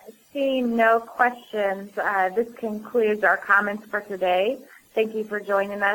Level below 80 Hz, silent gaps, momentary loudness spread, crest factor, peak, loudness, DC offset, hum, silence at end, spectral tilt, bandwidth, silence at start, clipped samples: -68 dBFS; none; 10 LU; 18 dB; -6 dBFS; -23 LUFS; under 0.1%; none; 0 s; -5 dB/octave; 19.5 kHz; 0.05 s; under 0.1%